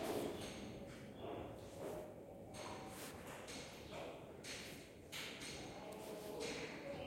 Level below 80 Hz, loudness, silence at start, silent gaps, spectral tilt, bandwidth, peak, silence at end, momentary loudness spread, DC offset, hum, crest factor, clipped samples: -70 dBFS; -50 LUFS; 0 s; none; -4 dB/octave; 16.5 kHz; -32 dBFS; 0 s; 7 LU; under 0.1%; none; 18 dB; under 0.1%